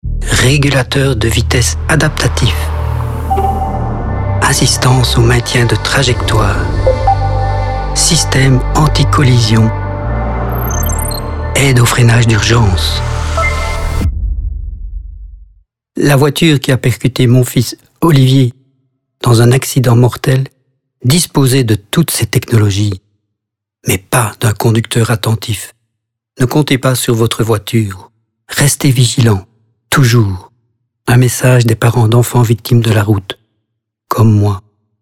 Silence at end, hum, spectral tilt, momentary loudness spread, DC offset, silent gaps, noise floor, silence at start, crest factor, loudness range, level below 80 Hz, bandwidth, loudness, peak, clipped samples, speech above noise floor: 0.4 s; none; -5 dB/octave; 9 LU; under 0.1%; none; -77 dBFS; 0.05 s; 12 dB; 3 LU; -22 dBFS; 16.5 kHz; -11 LUFS; 0 dBFS; under 0.1%; 68 dB